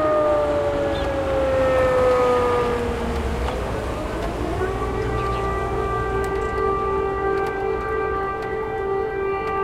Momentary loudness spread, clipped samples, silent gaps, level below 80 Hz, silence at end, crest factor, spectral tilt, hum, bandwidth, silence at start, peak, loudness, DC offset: 7 LU; under 0.1%; none; -32 dBFS; 0 s; 14 dB; -6.5 dB/octave; none; 15 kHz; 0 s; -8 dBFS; -22 LUFS; under 0.1%